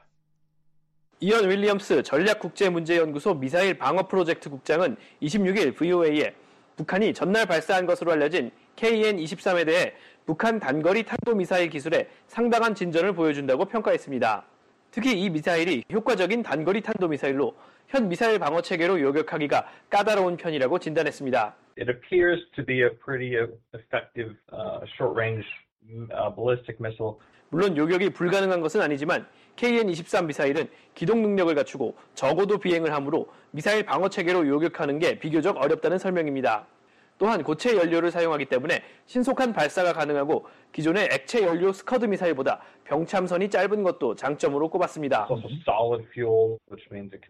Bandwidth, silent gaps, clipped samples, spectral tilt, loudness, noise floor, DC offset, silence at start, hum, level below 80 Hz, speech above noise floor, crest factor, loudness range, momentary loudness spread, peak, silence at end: 13.5 kHz; 25.72-25.76 s; under 0.1%; -5.5 dB/octave; -25 LUFS; -67 dBFS; under 0.1%; 1.2 s; none; -64 dBFS; 42 dB; 16 dB; 2 LU; 9 LU; -10 dBFS; 0.1 s